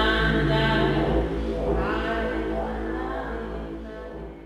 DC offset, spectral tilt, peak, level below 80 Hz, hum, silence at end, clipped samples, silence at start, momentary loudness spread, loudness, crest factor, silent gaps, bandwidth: under 0.1%; -7 dB/octave; -10 dBFS; -32 dBFS; none; 0 s; under 0.1%; 0 s; 14 LU; -25 LUFS; 16 dB; none; 12.5 kHz